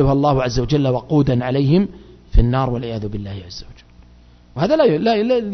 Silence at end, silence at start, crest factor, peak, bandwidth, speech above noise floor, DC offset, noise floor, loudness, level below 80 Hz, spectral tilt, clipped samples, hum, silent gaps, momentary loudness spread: 0 s; 0 s; 18 dB; 0 dBFS; 6.4 kHz; 30 dB; under 0.1%; -46 dBFS; -18 LUFS; -28 dBFS; -7.5 dB/octave; under 0.1%; 60 Hz at -45 dBFS; none; 15 LU